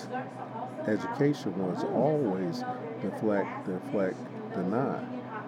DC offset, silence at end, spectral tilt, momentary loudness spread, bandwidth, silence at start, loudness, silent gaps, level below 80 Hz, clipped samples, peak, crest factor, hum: under 0.1%; 0 s; -7.5 dB/octave; 10 LU; 14 kHz; 0 s; -31 LUFS; none; -90 dBFS; under 0.1%; -14 dBFS; 18 dB; none